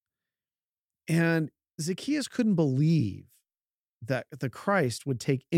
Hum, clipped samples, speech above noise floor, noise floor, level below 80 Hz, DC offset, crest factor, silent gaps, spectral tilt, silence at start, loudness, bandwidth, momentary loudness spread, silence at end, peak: none; under 0.1%; over 63 dB; under -90 dBFS; -74 dBFS; under 0.1%; 18 dB; 1.74-1.78 s, 3.74-4.01 s; -6.5 dB/octave; 1.1 s; -28 LUFS; 15 kHz; 12 LU; 0 s; -12 dBFS